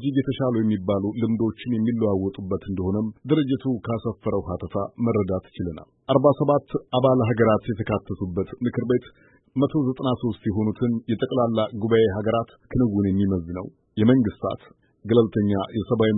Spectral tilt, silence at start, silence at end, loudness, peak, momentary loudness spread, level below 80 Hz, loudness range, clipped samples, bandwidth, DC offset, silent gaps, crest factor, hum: -12.5 dB/octave; 0 s; 0 s; -23 LUFS; -4 dBFS; 9 LU; -50 dBFS; 3 LU; under 0.1%; 4 kHz; under 0.1%; none; 18 dB; none